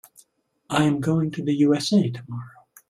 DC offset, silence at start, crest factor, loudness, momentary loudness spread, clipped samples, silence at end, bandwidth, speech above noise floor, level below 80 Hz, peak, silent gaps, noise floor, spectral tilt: under 0.1%; 0.7 s; 18 dB; -22 LUFS; 15 LU; under 0.1%; 0.4 s; 14 kHz; 40 dB; -60 dBFS; -6 dBFS; none; -61 dBFS; -6 dB/octave